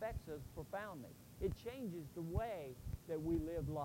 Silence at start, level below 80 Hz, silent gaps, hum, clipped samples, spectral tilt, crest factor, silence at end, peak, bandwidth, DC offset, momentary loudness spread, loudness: 0 s; -54 dBFS; none; none; under 0.1%; -7.5 dB/octave; 18 dB; 0 s; -26 dBFS; 16 kHz; under 0.1%; 10 LU; -46 LUFS